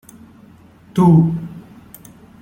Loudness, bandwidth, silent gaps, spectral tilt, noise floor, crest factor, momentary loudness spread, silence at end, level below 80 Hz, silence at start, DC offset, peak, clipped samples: -15 LUFS; 14 kHz; none; -9.5 dB/octave; -45 dBFS; 16 dB; 23 LU; 0.8 s; -50 dBFS; 0.95 s; under 0.1%; -2 dBFS; under 0.1%